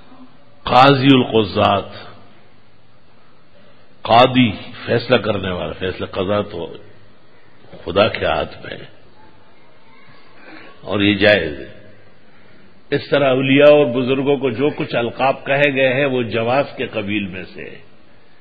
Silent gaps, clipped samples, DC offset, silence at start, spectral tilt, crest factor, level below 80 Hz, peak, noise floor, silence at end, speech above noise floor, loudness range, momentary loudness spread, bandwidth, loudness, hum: none; under 0.1%; 1%; 0.2 s; -8 dB/octave; 18 dB; -46 dBFS; 0 dBFS; -52 dBFS; 0.65 s; 36 dB; 8 LU; 21 LU; 8 kHz; -16 LUFS; none